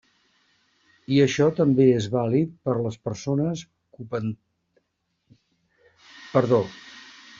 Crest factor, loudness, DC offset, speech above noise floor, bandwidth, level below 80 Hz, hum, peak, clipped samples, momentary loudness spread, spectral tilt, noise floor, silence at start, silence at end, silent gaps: 20 dB; -23 LUFS; under 0.1%; 53 dB; 7.6 kHz; -62 dBFS; none; -4 dBFS; under 0.1%; 23 LU; -7 dB/octave; -75 dBFS; 1.1 s; 0.4 s; none